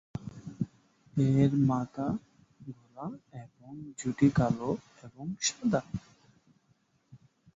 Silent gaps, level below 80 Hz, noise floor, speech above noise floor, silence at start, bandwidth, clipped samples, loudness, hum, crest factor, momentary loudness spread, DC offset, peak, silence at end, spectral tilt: none; -58 dBFS; -70 dBFS; 41 dB; 0.15 s; 8 kHz; under 0.1%; -31 LUFS; none; 20 dB; 22 LU; under 0.1%; -12 dBFS; 0.4 s; -6 dB/octave